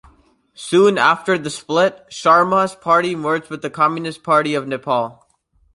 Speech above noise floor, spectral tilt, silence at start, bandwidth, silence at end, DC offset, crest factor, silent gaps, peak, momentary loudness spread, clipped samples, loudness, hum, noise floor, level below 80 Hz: 43 dB; -5 dB/octave; 0.6 s; 11.5 kHz; 0.65 s; under 0.1%; 16 dB; none; -2 dBFS; 9 LU; under 0.1%; -17 LUFS; none; -60 dBFS; -60 dBFS